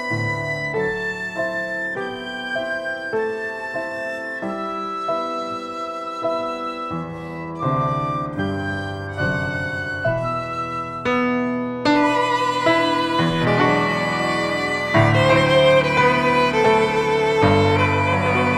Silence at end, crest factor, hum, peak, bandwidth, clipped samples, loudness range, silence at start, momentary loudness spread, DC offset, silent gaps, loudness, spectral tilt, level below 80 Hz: 0 s; 18 dB; none; -2 dBFS; 13.5 kHz; under 0.1%; 9 LU; 0 s; 11 LU; under 0.1%; none; -20 LUFS; -6 dB/octave; -46 dBFS